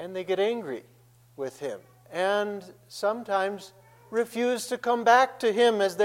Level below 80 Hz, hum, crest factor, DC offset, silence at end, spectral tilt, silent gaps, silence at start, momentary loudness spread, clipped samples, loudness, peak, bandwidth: -78 dBFS; none; 20 dB; under 0.1%; 0 s; -3.5 dB/octave; none; 0 s; 17 LU; under 0.1%; -26 LUFS; -6 dBFS; 16.5 kHz